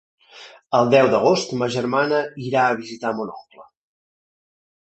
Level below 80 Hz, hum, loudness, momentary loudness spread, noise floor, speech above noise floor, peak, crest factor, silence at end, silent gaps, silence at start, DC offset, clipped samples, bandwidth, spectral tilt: -64 dBFS; none; -20 LUFS; 11 LU; -45 dBFS; 26 dB; -2 dBFS; 20 dB; 1.2 s; none; 0.35 s; under 0.1%; under 0.1%; 8.4 kHz; -5 dB/octave